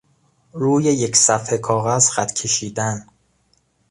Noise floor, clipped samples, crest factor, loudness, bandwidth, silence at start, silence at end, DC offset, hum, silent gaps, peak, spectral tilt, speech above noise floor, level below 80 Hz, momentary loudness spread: -63 dBFS; under 0.1%; 20 dB; -17 LUFS; 11.5 kHz; 0.55 s; 0.9 s; under 0.1%; none; none; 0 dBFS; -3.5 dB/octave; 44 dB; -56 dBFS; 10 LU